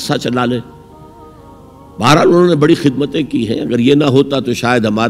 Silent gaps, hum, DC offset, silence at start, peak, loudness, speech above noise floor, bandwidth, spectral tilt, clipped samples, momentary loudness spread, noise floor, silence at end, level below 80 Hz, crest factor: none; none; under 0.1%; 0 s; 0 dBFS; -12 LUFS; 26 dB; 15.5 kHz; -6 dB/octave; under 0.1%; 8 LU; -38 dBFS; 0 s; -46 dBFS; 14 dB